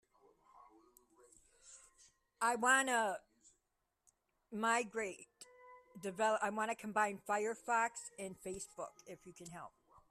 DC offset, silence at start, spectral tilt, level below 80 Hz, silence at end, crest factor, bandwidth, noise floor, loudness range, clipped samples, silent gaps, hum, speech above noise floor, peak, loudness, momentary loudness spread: under 0.1%; 0.55 s; -2.5 dB/octave; -78 dBFS; 0.4 s; 22 dB; 14 kHz; -86 dBFS; 4 LU; under 0.1%; none; none; 47 dB; -18 dBFS; -37 LUFS; 25 LU